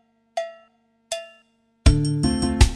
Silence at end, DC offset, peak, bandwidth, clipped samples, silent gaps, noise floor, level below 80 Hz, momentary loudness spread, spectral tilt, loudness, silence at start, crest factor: 0 s; under 0.1%; -2 dBFS; 13 kHz; under 0.1%; none; -61 dBFS; -26 dBFS; 13 LU; -5.5 dB/octave; -23 LUFS; 0.35 s; 20 dB